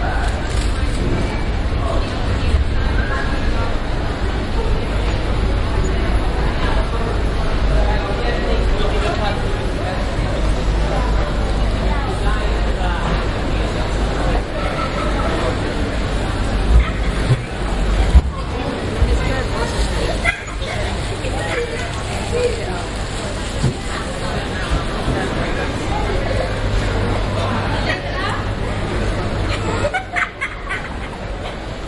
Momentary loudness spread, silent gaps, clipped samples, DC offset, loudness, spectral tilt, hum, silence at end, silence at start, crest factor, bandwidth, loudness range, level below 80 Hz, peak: 4 LU; none; under 0.1%; under 0.1%; -20 LUFS; -5.5 dB/octave; none; 0 s; 0 s; 18 dB; 11.5 kHz; 3 LU; -20 dBFS; 0 dBFS